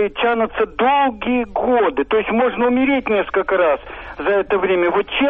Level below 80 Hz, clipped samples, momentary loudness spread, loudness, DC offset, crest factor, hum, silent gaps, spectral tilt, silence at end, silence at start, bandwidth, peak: -44 dBFS; under 0.1%; 4 LU; -17 LUFS; under 0.1%; 10 dB; none; none; -8 dB/octave; 0 s; 0 s; 4.3 kHz; -6 dBFS